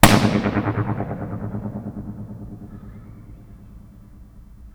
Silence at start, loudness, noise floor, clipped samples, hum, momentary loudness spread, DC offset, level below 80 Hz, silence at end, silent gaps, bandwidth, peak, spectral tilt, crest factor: 0 s; -23 LUFS; -44 dBFS; under 0.1%; none; 25 LU; under 0.1%; -36 dBFS; 0.05 s; none; over 20 kHz; 0 dBFS; -5 dB/octave; 22 dB